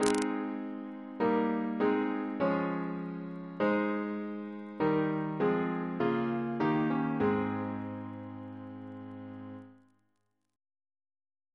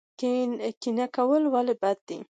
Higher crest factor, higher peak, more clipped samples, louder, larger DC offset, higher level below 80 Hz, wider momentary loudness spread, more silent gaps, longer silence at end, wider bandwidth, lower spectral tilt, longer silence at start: first, 26 dB vs 14 dB; first, -8 dBFS vs -14 dBFS; neither; second, -32 LUFS vs -27 LUFS; neither; first, -70 dBFS vs -82 dBFS; first, 15 LU vs 7 LU; second, none vs 0.77-0.81 s, 2.01-2.07 s; first, 1.8 s vs 0.1 s; first, 11 kHz vs 9.2 kHz; about the same, -6.5 dB/octave vs -5.5 dB/octave; second, 0 s vs 0.2 s